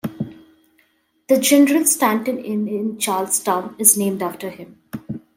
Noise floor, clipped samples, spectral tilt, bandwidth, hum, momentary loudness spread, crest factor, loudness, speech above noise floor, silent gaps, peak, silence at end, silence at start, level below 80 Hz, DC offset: -62 dBFS; under 0.1%; -3 dB/octave; 16.5 kHz; none; 18 LU; 20 dB; -17 LUFS; 43 dB; none; 0 dBFS; 0.2 s; 0.05 s; -66 dBFS; under 0.1%